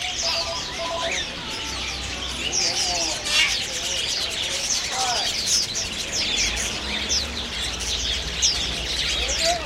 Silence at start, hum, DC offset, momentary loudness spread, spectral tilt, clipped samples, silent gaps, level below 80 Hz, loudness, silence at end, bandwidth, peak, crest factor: 0 s; none; under 0.1%; 7 LU; -0.5 dB/octave; under 0.1%; none; -38 dBFS; -22 LUFS; 0 s; 16 kHz; -6 dBFS; 20 dB